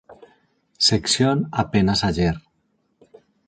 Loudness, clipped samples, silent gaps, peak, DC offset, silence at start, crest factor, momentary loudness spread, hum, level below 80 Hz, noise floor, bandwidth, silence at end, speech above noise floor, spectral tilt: -20 LUFS; under 0.1%; none; -6 dBFS; under 0.1%; 0.1 s; 18 dB; 5 LU; none; -42 dBFS; -68 dBFS; 9.4 kHz; 1.1 s; 49 dB; -4.5 dB/octave